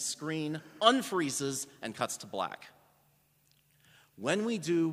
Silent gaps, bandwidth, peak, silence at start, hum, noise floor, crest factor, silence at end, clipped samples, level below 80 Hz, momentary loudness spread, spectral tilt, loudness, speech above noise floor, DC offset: none; 15.5 kHz; -6 dBFS; 0 s; none; -69 dBFS; 28 dB; 0 s; under 0.1%; -80 dBFS; 12 LU; -3.5 dB/octave; -32 LUFS; 37 dB; under 0.1%